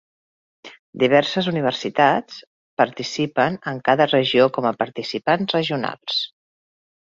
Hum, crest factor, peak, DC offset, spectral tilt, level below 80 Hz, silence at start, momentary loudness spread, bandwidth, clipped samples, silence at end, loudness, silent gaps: none; 20 dB; -2 dBFS; under 0.1%; -5.5 dB/octave; -64 dBFS; 0.65 s; 9 LU; 7.8 kHz; under 0.1%; 0.95 s; -20 LUFS; 0.79-0.93 s, 2.47-2.77 s